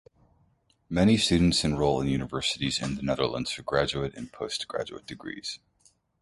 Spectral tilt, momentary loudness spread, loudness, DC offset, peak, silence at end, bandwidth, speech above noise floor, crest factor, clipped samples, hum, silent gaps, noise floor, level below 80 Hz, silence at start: -5 dB/octave; 15 LU; -27 LUFS; under 0.1%; -10 dBFS; 0.65 s; 11.5 kHz; 40 dB; 18 dB; under 0.1%; none; none; -67 dBFS; -46 dBFS; 0.9 s